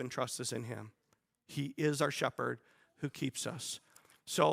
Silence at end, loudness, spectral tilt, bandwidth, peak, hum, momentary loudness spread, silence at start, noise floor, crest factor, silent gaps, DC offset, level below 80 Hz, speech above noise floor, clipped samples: 0 s; -38 LUFS; -4 dB/octave; 16 kHz; -14 dBFS; none; 14 LU; 0 s; -71 dBFS; 24 dB; none; under 0.1%; -78 dBFS; 33 dB; under 0.1%